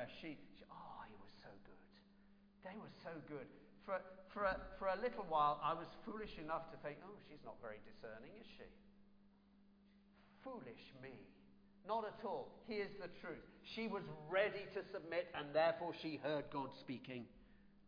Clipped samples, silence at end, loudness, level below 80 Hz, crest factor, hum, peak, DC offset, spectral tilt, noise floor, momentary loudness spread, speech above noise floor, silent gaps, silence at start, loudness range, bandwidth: under 0.1%; 0 s; -45 LUFS; -70 dBFS; 22 dB; none; -24 dBFS; under 0.1%; -3 dB/octave; -70 dBFS; 20 LU; 24 dB; none; 0 s; 16 LU; 5.2 kHz